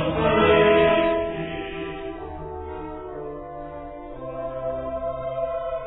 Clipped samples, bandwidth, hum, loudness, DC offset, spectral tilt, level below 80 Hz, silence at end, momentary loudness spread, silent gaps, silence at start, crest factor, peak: under 0.1%; 4.1 kHz; none; -23 LUFS; under 0.1%; -10 dB/octave; -42 dBFS; 0 s; 19 LU; none; 0 s; 18 dB; -6 dBFS